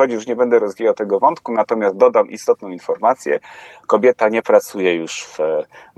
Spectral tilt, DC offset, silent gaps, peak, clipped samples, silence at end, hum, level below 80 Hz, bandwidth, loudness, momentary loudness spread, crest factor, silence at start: -4.5 dB/octave; under 0.1%; none; 0 dBFS; under 0.1%; 0.2 s; none; -72 dBFS; 13 kHz; -17 LUFS; 8 LU; 16 dB; 0 s